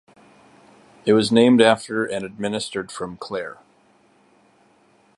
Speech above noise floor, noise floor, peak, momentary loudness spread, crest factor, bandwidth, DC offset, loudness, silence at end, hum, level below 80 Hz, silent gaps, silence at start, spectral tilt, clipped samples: 38 dB; -58 dBFS; -2 dBFS; 16 LU; 22 dB; 11.5 kHz; under 0.1%; -20 LUFS; 1.65 s; none; -62 dBFS; none; 1.05 s; -5 dB/octave; under 0.1%